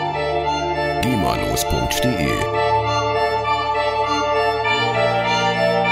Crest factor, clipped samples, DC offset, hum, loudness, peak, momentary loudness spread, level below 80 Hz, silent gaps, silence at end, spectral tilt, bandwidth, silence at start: 14 dB; under 0.1%; under 0.1%; none; -19 LUFS; -4 dBFS; 3 LU; -36 dBFS; none; 0 s; -4.5 dB/octave; 16 kHz; 0 s